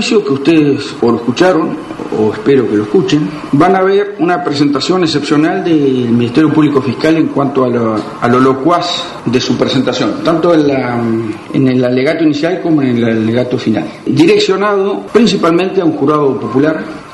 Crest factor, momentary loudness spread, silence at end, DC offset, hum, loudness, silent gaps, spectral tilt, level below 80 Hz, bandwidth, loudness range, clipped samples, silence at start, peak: 10 dB; 5 LU; 0 s; under 0.1%; none; -11 LUFS; none; -6 dB/octave; -48 dBFS; 11.5 kHz; 1 LU; under 0.1%; 0 s; 0 dBFS